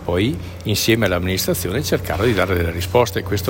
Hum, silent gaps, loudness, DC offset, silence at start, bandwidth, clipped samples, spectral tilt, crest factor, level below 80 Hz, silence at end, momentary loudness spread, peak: none; none; -19 LUFS; under 0.1%; 0 s; 17 kHz; under 0.1%; -5 dB/octave; 16 dB; -40 dBFS; 0 s; 4 LU; -4 dBFS